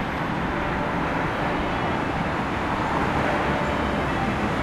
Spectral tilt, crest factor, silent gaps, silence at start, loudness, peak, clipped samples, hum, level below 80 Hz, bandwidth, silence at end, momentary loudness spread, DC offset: -6.5 dB/octave; 14 dB; none; 0 s; -24 LUFS; -10 dBFS; under 0.1%; none; -38 dBFS; 15.5 kHz; 0 s; 3 LU; under 0.1%